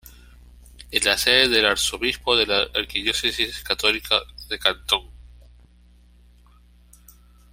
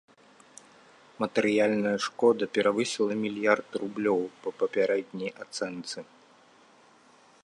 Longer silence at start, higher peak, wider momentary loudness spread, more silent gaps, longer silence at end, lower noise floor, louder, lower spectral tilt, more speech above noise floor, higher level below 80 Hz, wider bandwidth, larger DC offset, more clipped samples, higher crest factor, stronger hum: second, 0.05 s vs 1.2 s; first, -2 dBFS vs -8 dBFS; second, 8 LU vs 11 LU; neither; first, 2.2 s vs 1.4 s; second, -53 dBFS vs -58 dBFS; first, -20 LUFS vs -28 LUFS; second, -1 dB/octave vs -4.5 dB/octave; about the same, 31 dB vs 31 dB; first, -46 dBFS vs -76 dBFS; first, 16 kHz vs 11 kHz; neither; neither; about the same, 24 dB vs 22 dB; first, 60 Hz at -45 dBFS vs none